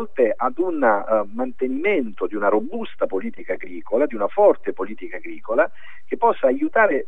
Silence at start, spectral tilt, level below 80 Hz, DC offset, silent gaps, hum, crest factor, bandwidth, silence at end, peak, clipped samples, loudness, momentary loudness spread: 0 s; -7.5 dB/octave; -64 dBFS; 4%; none; none; 18 dB; 3.9 kHz; 0.05 s; -4 dBFS; under 0.1%; -21 LUFS; 12 LU